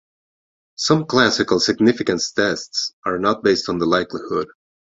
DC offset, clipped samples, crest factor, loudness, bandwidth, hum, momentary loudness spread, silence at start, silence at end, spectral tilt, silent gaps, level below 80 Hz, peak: under 0.1%; under 0.1%; 18 dB; -19 LUFS; 8 kHz; none; 8 LU; 0.8 s; 0.5 s; -4 dB/octave; 2.93-3.03 s; -54 dBFS; -2 dBFS